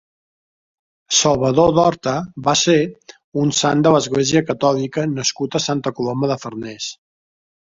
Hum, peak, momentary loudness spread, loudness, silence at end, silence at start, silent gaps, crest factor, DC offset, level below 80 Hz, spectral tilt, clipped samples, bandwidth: none; 0 dBFS; 12 LU; -17 LUFS; 0.8 s; 1.1 s; 3.24-3.32 s; 18 dB; under 0.1%; -50 dBFS; -4 dB/octave; under 0.1%; 7.8 kHz